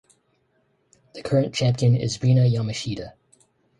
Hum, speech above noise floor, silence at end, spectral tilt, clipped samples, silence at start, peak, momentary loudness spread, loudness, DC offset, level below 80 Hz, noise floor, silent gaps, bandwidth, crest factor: none; 46 dB; 0.7 s; -6.5 dB/octave; under 0.1%; 1.15 s; -8 dBFS; 17 LU; -22 LUFS; under 0.1%; -54 dBFS; -67 dBFS; none; 10.5 kHz; 16 dB